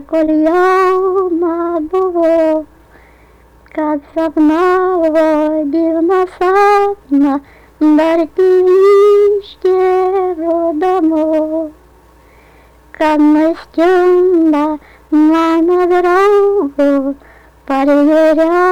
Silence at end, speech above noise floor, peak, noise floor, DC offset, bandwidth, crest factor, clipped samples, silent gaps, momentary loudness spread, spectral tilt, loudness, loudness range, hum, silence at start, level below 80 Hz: 0 s; 33 dB; -4 dBFS; -44 dBFS; under 0.1%; 10.5 kHz; 8 dB; under 0.1%; none; 8 LU; -5.5 dB/octave; -12 LUFS; 4 LU; none; 0 s; -46 dBFS